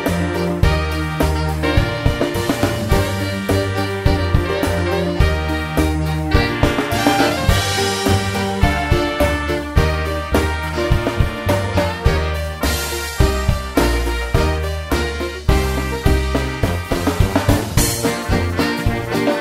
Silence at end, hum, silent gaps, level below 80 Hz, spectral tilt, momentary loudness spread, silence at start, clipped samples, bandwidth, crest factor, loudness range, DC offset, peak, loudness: 0 s; none; none; -24 dBFS; -5 dB/octave; 4 LU; 0 s; under 0.1%; 16 kHz; 16 dB; 2 LU; under 0.1%; 0 dBFS; -18 LUFS